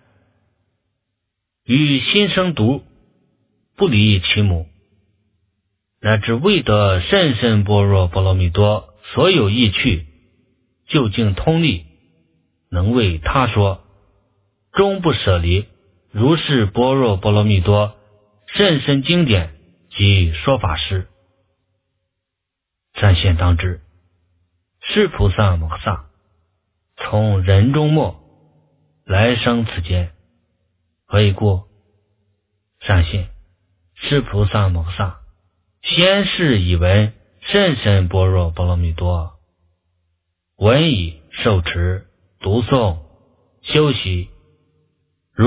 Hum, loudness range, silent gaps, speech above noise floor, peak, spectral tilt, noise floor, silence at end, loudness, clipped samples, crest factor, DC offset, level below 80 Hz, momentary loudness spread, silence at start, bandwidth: none; 5 LU; none; 65 dB; 0 dBFS; -10.5 dB/octave; -80 dBFS; 0 s; -16 LUFS; under 0.1%; 18 dB; under 0.1%; -28 dBFS; 11 LU; 1.7 s; 4 kHz